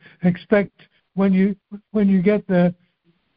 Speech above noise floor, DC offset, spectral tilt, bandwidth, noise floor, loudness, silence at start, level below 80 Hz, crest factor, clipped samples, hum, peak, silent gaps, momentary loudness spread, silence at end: 46 dB; under 0.1%; -8 dB/octave; 4.9 kHz; -64 dBFS; -19 LUFS; 0.2 s; -54 dBFS; 16 dB; under 0.1%; none; -4 dBFS; none; 11 LU; 0.65 s